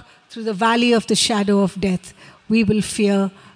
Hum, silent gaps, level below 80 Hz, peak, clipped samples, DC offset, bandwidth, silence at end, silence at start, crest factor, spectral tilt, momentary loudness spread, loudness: none; none; -50 dBFS; -4 dBFS; under 0.1%; under 0.1%; 10.5 kHz; 0.25 s; 0.3 s; 14 dB; -4.5 dB/octave; 11 LU; -18 LUFS